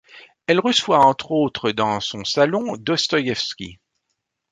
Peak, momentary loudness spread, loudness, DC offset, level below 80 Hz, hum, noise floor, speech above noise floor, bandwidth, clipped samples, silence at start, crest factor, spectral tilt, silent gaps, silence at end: -2 dBFS; 10 LU; -19 LUFS; under 0.1%; -58 dBFS; none; -76 dBFS; 57 dB; 11 kHz; under 0.1%; 0.15 s; 18 dB; -4 dB/octave; none; 0.8 s